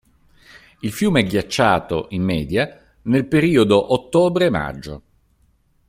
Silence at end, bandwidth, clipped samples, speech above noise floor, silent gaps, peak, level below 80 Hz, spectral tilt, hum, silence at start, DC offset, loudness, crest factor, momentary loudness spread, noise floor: 0.9 s; 16 kHz; under 0.1%; 42 dB; none; -2 dBFS; -46 dBFS; -6 dB/octave; none; 0.85 s; under 0.1%; -18 LUFS; 18 dB; 14 LU; -60 dBFS